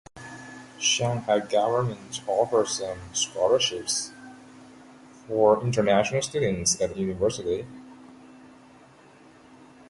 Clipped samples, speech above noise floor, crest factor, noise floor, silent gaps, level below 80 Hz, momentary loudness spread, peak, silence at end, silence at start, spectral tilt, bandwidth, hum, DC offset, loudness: under 0.1%; 28 dB; 20 dB; -53 dBFS; none; -56 dBFS; 19 LU; -6 dBFS; 1.45 s; 0.15 s; -3.5 dB/octave; 11.5 kHz; none; under 0.1%; -25 LUFS